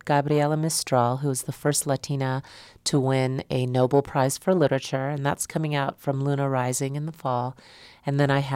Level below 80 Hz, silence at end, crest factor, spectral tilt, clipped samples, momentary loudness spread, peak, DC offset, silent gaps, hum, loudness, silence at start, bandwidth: -60 dBFS; 0 s; 16 dB; -5 dB/octave; under 0.1%; 7 LU; -8 dBFS; under 0.1%; none; none; -25 LUFS; 0.05 s; 16 kHz